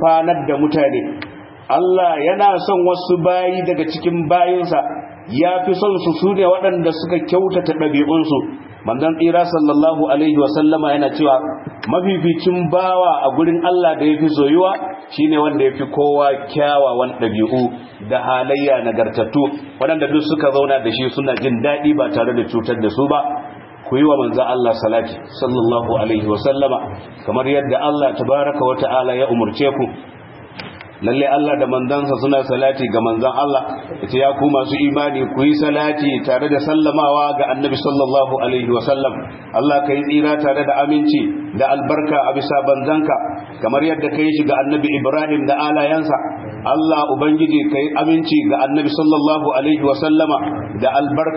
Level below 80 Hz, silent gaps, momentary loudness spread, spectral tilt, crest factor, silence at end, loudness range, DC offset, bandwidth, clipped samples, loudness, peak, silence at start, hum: -56 dBFS; none; 7 LU; -11.5 dB/octave; 16 dB; 0 s; 2 LU; under 0.1%; 5.8 kHz; under 0.1%; -16 LUFS; 0 dBFS; 0 s; none